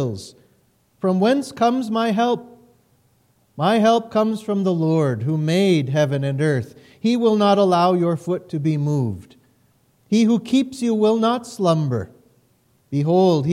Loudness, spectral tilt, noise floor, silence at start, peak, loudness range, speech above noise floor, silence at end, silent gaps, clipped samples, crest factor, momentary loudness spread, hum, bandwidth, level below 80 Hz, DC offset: -19 LUFS; -7 dB/octave; -61 dBFS; 0 s; -6 dBFS; 3 LU; 42 dB; 0 s; none; under 0.1%; 14 dB; 9 LU; none; 13.5 kHz; -64 dBFS; under 0.1%